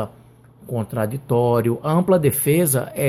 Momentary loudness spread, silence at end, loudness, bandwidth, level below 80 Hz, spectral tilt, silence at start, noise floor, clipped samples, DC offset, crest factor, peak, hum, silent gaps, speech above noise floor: 10 LU; 0 s; -19 LUFS; 16 kHz; -54 dBFS; -6 dB/octave; 0 s; -48 dBFS; under 0.1%; under 0.1%; 14 dB; -6 dBFS; none; none; 29 dB